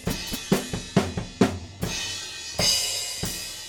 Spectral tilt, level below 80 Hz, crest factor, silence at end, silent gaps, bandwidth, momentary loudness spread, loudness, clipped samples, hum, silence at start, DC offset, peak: -3.5 dB/octave; -46 dBFS; 22 dB; 0 s; none; over 20 kHz; 10 LU; -26 LUFS; under 0.1%; none; 0 s; under 0.1%; -6 dBFS